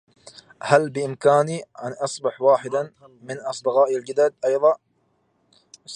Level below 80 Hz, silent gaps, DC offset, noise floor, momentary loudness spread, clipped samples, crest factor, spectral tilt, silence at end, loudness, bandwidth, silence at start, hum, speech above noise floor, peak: -72 dBFS; none; under 0.1%; -67 dBFS; 13 LU; under 0.1%; 22 dB; -5 dB/octave; 0 s; -21 LUFS; 10.5 kHz; 0.65 s; none; 46 dB; 0 dBFS